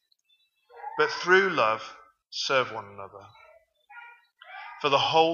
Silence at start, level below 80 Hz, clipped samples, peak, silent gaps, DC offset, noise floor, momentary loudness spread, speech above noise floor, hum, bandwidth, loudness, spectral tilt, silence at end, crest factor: 0.75 s; -78 dBFS; under 0.1%; -6 dBFS; none; under 0.1%; -69 dBFS; 24 LU; 44 dB; none; 7.2 kHz; -25 LUFS; -3.5 dB/octave; 0 s; 22 dB